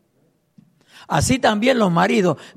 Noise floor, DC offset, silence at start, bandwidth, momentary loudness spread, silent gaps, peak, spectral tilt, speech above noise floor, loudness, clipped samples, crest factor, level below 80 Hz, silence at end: -63 dBFS; under 0.1%; 1.1 s; 14.5 kHz; 4 LU; none; -4 dBFS; -5 dB/octave; 46 dB; -17 LUFS; under 0.1%; 16 dB; -46 dBFS; 0.1 s